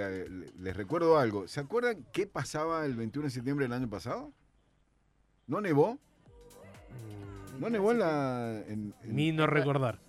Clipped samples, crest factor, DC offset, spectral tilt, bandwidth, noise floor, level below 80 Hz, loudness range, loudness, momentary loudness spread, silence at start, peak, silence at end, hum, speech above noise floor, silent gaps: under 0.1%; 18 dB; under 0.1%; -6.5 dB/octave; 14 kHz; -70 dBFS; -62 dBFS; 5 LU; -32 LUFS; 18 LU; 0 s; -14 dBFS; 0.15 s; none; 39 dB; none